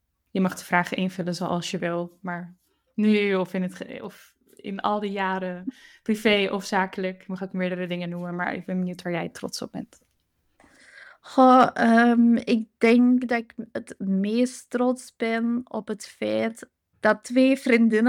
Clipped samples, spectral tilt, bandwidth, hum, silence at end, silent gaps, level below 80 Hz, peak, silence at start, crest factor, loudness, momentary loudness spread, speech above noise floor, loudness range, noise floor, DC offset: under 0.1%; -6 dB/octave; 14 kHz; none; 0 s; none; -68 dBFS; -6 dBFS; 0.35 s; 18 dB; -24 LUFS; 17 LU; 47 dB; 10 LU; -71 dBFS; under 0.1%